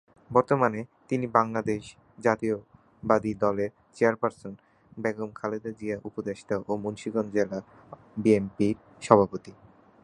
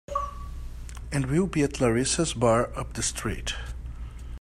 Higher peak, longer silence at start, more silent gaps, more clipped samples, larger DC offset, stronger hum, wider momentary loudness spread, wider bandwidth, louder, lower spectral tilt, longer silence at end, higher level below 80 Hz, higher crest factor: first, -2 dBFS vs -8 dBFS; first, 0.3 s vs 0.1 s; neither; neither; neither; neither; second, 12 LU vs 18 LU; second, 10.5 kHz vs 14 kHz; about the same, -28 LUFS vs -27 LUFS; first, -7 dB/octave vs -4.5 dB/octave; first, 0.5 s vs 0 s; second, -60 dBFS vs -38 dBFS; first, 26 dB vs 20 dB